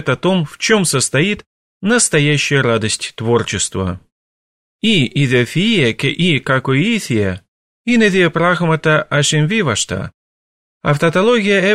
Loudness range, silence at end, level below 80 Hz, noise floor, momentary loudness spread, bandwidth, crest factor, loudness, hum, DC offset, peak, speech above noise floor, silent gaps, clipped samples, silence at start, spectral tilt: 2 LU; 0 s; -48 dBFS; under -90 dBFS; 9 LU; 14.5 kHz; 14 dB; -15 LUFS; none; under 0.1%; -2 dBFS; over 76 dB; 1.46-1.81 s, 4.12-4.79 s, 7.48-7.85 s, 10.14-10.81 s; under 0.1%; 0 s; -4.5 dB/octave